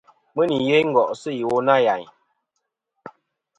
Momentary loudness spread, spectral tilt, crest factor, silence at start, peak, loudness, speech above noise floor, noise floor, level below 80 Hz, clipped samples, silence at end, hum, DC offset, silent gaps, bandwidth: 9 LU; -6 dB/octave; 20 dB; 0.35 s; -2 dBFS; -20 LUFS; 59 dB; -78 dBFS; -66 dBFS; under 0.1%; 0.5 s; none; under 0.1%; none; 9.2 kHz